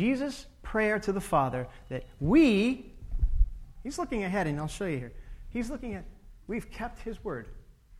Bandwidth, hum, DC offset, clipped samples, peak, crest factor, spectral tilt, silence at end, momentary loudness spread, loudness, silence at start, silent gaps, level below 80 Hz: 14.5 kHz; none; under 0.1%; under 0.1%; -12 dBFS; 18 dB; -6.5 dB/octave; 0 s; 16 LU; -31 LUFS; 0 s; none; -38 dBFS